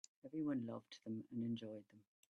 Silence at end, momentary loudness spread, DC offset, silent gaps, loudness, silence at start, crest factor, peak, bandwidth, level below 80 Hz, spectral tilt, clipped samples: 0.4 s; 10 LU; under 0.1%; none; -47 LUFS; 0.25 s; 14 dB; -32 dBFS; 8.2 kHz; -86 dBFS; -7 dB/octave; under 0.1%